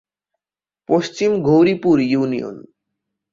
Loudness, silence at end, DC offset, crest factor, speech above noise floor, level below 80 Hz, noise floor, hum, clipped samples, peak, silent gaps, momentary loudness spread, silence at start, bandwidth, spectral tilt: -17 LUFS; 0.7 s; under 0.1%; 16 dB; over 74 dB; -56 dBFS; under -90 dBFS; none; under 0.1%; -4 dBFS; none; 9 LU; 0.9 s; 7.6 kHz; -7 dB/octave